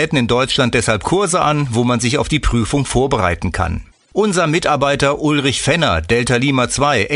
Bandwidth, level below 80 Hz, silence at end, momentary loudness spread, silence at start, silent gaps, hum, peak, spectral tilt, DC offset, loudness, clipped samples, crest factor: 11 kHz; -30 dBFS; 0 s; 4 LU; 0 s; none; none; 0 dBFS; -4.5 dB/octave; under 0.1%; -15 LUFS; under 0.1%; 14 dB